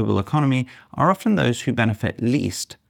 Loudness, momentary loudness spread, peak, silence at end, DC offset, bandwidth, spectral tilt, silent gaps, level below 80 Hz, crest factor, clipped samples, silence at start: -21 LUFS; 5 LU; -4 dBFS; 0.15 s; under 0.1%; 18 kHz; -6 dB/octave; none; -56 dBFS; 16 dB; under 0.1%; 0 s